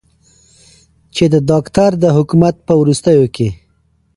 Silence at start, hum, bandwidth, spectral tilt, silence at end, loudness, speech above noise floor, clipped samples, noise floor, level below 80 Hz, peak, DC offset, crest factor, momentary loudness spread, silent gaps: 1.15 s; none; 11.5 kHz; -7 dB/octave; 0.6 s; -12 LUFS; 46 dB; under 0.1%; -57 dBFS; -42 dBFS; 0 dBFS; under 0.1%; 14 dB; 7 LU; none